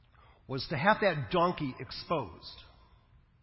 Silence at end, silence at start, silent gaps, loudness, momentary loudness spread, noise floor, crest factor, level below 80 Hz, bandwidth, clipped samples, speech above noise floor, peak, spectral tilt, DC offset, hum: 0.8 s; 0.5 s; none; -31 LUFS; 20 LU; -62 dBFS; 24 dB; -58 dBFS; 5.8 kHz; under 0.1%; 31 dB; -10 dBFS; -9.5 dB/octave; under 0.1%; none